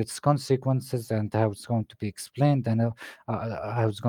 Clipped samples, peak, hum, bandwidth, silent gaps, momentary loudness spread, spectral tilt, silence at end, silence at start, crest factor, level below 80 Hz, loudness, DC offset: under 0.1%; -8 dBFS; none; 16.5 kHz; none; 10 LU; -7 dB/octave; 0 s; 0 s; 18 dB; -64 dBFS; -27 LUFS; under 0.1%